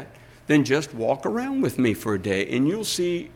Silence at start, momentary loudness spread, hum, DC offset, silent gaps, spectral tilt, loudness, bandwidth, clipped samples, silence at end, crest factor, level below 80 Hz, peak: 0 s; 5 LU; none; under 0.1%; none; -5 dB/octave; -24 LUFS; 17 kHz; under 0.1%; 0.05 s; 16 dB; -56 dBFS; -8 dBFS